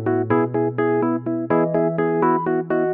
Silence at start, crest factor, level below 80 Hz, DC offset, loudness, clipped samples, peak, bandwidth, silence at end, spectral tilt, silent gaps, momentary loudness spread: 0 s; 16 dB; -62 dBFS; under 0.1%; -20 LUFS; under 0.1%; -4 dBFS; 3.5 kHz; 0 s; -12 dB/octave; none; 3 LU